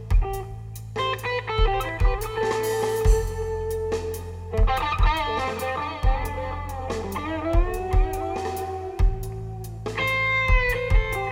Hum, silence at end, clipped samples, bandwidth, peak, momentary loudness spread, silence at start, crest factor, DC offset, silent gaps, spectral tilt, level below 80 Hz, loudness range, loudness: none; 0 s; under 0.1%; 16.5 kHz; -6 dBFS; 10 LU; 0 s; 16 dB; under 0.1%; none; -5.5 dB/octave; -26 dBFS; 3 LU; -26 LUFS